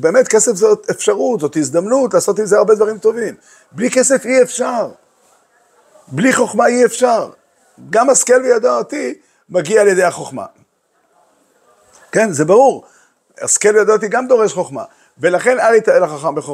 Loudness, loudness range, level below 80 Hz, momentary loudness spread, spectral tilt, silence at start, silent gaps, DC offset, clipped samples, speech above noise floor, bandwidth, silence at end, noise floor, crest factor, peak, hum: -13 LUFS; 4 LU; -66 dBFS; 13 LU; -3.5 dB/octave; 0 s; none; under 0.1%; under 0.1%; 47 dB; 15 kHz; 0 s; -60 dBFS; 14 dB; 0 dBFS; none